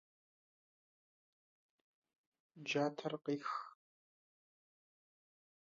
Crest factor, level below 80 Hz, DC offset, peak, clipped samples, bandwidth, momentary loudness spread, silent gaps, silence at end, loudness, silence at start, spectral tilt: 22 dB; under -90 dBFS; under 0.1%; -24 dBFS; under 0.1%; 7.4 kHz; 11 LU; none; 2.1 s; -41 LUFS; 2.55 s; -3.5 dB/octave